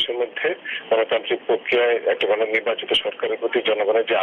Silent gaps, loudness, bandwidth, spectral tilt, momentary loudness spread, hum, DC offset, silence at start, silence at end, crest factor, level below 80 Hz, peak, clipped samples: none; -21 LUFS; 9.8 kHz; -4 dB/octave; 5 LU; none; under 0.1%; 0 s; 0 s; 14 dB; -66 dBFS; -8 dBFS; under 0.1%